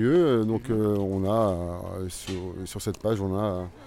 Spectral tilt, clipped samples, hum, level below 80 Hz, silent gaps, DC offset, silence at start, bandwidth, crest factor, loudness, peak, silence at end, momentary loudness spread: -7 dB/octave; under 0.1%; none; -50 dBFS; none; under 0.1%; 0 s; 16.5 kHz; 14 dB; -27 LUFS; -12 dBFS; 0 s; 11 LU